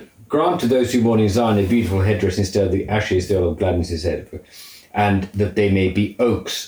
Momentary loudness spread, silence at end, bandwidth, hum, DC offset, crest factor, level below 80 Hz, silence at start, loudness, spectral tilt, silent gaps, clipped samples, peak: 8 LU; 0 s; over 20 kHz; none; under 0.1%; 14 dB; -44 dBFS; 0 s; -19 LUFS; -6.5 dB/octave; none; under 0.1%; -6 dBFS